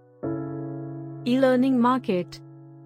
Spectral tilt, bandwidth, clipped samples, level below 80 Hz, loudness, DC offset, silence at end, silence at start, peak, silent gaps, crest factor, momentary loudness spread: -7.5 dB/octave; 10 kHz; under 0.1%; -66 dBFS; -24 LUFS; under 0.1%; 0 s; 0.2 s; -8 dBFS; none; 16 dB; 16 LU